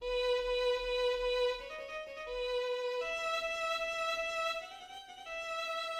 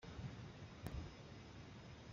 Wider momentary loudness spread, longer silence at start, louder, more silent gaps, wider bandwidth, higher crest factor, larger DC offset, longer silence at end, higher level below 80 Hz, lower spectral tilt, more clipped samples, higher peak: first, 10 LU vs 6 LU; about the same, 0 s vs 0 s; first, -35 LUFS vs -54 LUFS; neither; first, 15.5 kHz vs 7.4 kHz; second, 14 dB vs 22 dB; neither; about the same, 0 s vs 0 s; about the same, -58 dBFS vs -60 dBFS; second, -0.5 dB/octave vs -5.5 dB/octave; neither; first, -22 dBFS vs -30 dBFS